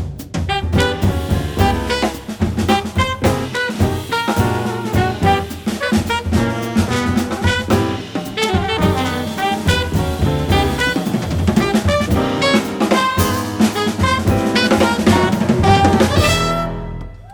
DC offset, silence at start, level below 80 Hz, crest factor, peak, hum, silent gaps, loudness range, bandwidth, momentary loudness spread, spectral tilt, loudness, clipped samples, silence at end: under 0.1%; 0 s; -30 dBFS; 14 dB; -2 dBFS; none; none; 4 LU; over 20 kHz; 7 LU; -5.5 dB/octave; -17 LUFS; under 0.1%; 0 s